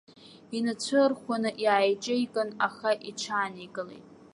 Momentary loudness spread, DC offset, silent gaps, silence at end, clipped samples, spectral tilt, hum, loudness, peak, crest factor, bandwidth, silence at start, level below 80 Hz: 13 LU; under 0.1%; none; 0.3 s; under 0.1%; -3.5 dB/octave; none; -28 LUFS; -10 dBFS; 18 dB; 11.5 kHz; 0.5 s; -78 dBFS